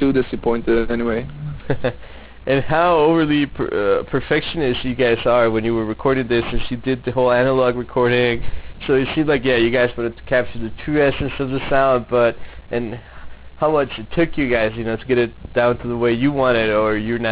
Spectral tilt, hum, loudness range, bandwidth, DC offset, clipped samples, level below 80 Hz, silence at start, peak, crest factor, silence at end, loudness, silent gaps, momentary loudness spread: -10 dB/octave; none; 3 LU; 4 kHz; under 0.1%; under 0.1%; -38 dBFS; 0 s; -4 dBFS; 14 dB; 0 s; -19 LUFS; none; 10 LU